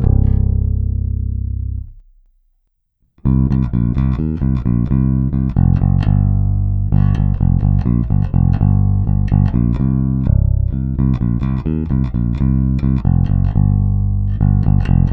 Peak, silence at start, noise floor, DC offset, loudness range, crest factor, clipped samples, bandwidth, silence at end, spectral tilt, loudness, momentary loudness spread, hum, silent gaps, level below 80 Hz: 0 dBFS; 0 s; -64 dBFS; under 0.1%; 5 LU; 14 dB; under 0.1%; 3.7 kHz; 0 s; -11.5 dB/octave; -16 LUFS; 5 LU; none; none; -20 dBFS